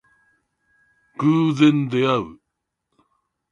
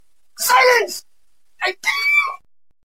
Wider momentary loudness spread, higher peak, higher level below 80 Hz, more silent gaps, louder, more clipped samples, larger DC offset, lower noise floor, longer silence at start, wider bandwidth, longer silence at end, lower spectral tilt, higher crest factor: about the same, 15 LU vs 14 LU; about the same, -4 dBFS vs -2 dBFS; first, -62 dBFS vs -68 dBFS; neither; second, -19 LUFS vs -16 LUFS; neither; second, under 0.1% vs 0.4%; first, -79 dBFS vs -68 dBFS; first, 1.2 s vs 0.4 s; second, 7.4 kHz vs 16.5 kHz; first, 1.15 s vs 0.5 s; first, -7.5 dB/octave vs 1 dB/octave; about the same, 18 dB vs 18 dB